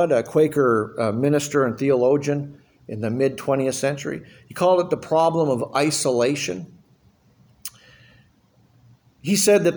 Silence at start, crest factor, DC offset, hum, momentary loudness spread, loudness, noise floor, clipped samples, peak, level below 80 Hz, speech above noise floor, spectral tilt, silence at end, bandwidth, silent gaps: 0 s; 16 dB; under 0.1%; none; 17 LU; -21 LUFS; -58 dBFS; under 0.1%; -6 dBFS; -62 dBFS; 38 dB; -5 dB/octave; 0 s; over 20 kHz; none